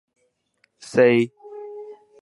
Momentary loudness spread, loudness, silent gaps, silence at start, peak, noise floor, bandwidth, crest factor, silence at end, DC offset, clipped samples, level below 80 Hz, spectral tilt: 23 LU; -19 LUFS; none; 0.9 s; -4 dBFS; -67 dBFS; 11.5 kHz; 20 dB; 0.3 s; under 0.1%; under 0.1%; -70 dBFS; -6 dB/octave